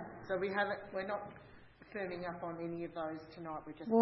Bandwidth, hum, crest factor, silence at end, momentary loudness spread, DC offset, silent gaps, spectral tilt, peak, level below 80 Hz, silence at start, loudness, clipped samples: 5.8 kHz; none; 22 dB; 0 s; 14 LU; under 0.1%; none; -4.5 dB/octave; -16 dBFS; -70 dBFS; 0 s; -41 LUFS; under 0.1%